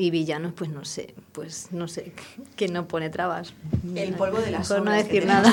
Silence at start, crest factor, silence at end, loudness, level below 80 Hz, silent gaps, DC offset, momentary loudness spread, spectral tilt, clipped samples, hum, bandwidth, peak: 0 s; 24 dB; 0 s; -26 LUFS; -54 dBFS; none; under 0.1%; 15 LU; -5 dB/octave; under 0.1%; none; 17 kHz; 0 dBFS